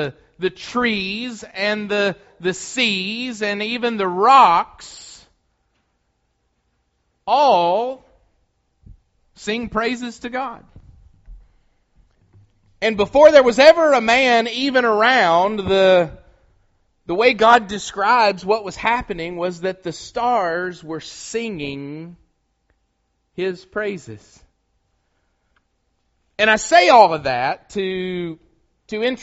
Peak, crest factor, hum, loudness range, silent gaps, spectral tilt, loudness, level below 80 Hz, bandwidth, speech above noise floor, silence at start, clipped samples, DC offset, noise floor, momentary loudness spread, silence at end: 0 dBFS; 20 dB; none; 15 LU; none; -2 dB/octave; -17 LUFS; -52 dBFS; 8 kHz; 51 dB; 0 s; under 0.1%; under 0.1%; -69 dBFS; 18 LU; 0 s